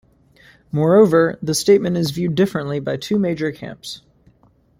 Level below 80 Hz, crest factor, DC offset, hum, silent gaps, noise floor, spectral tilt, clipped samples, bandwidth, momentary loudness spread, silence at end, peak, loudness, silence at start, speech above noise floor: -54 dBFS; 16 dB; under 0.1%; none; none; -56 dBFS; -5.5 dB/octave; under 0.1%; 16 kHz; 18 LU; 0.8 s; -2 dBFS; -18 LUFS; 0.75 s; 38 dB